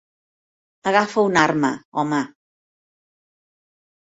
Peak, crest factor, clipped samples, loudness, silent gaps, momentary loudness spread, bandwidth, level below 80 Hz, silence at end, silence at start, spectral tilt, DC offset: -2 dBFS; 22 dB; under 0.1%; -20 LUFS; 1.85-1.92 s; 9 LU; 8 kHz; -64 dBFS; 1.85 s; 0.85 s; -5 dB/octave; under 0.1%